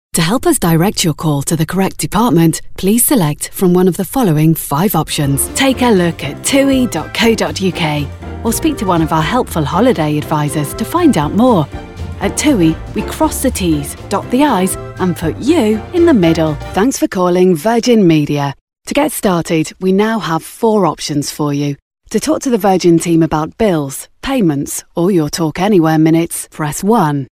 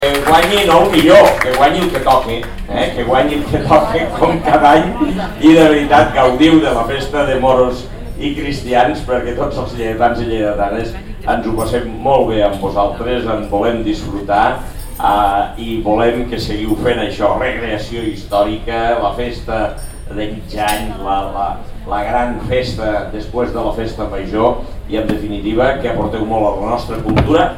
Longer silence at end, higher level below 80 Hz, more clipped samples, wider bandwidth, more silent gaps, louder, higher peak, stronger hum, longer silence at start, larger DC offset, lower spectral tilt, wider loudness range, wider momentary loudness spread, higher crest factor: about the same, 0.1 s vs 0 s; second, -34 dBFS vs -28 dBFS; neither; about the same, 17.5 kHz vs 17 kHz; first, 18.61-18.67 s, 21.82-21.91 s vs none; about the same, -13 LUFS vs -14 LUFS; about the same, 0 dBFS vs 0 dBFS; neither; first, 0.15 s vs 0 s; second, under 0.1% vs 0.4%; about the same, -5 dB/octave vs -5.5 dB/octave; second, 2 LU vs 8 LU; second, 8 LU vs 12 LU; about the same, 12 dB vs 14 dB